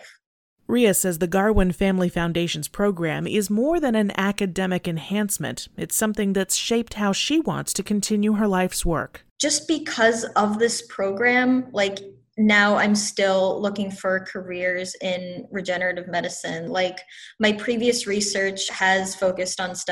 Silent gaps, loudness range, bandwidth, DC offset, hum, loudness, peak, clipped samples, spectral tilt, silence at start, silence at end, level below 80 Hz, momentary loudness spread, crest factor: 0.26-0.57 s, 9.31-9.36 s; 4 LU; 19 kHz; under 0.1%; none; -22 LUFS; -4 dBFS; under 0.1%; -4 dB/octave; 0 s; 0 s; -40 dBFS; 8 LU; 18 dB